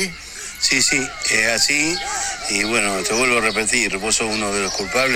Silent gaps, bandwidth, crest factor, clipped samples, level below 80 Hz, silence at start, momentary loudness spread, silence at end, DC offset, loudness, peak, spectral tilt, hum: none; 18 kHz; 18 dB; under 0.1%; -44 dBFS; 0 s; 7 LU; 0 s; under 0.1%; -17 LUFS; -2 dBFS; -1 dB/octave; none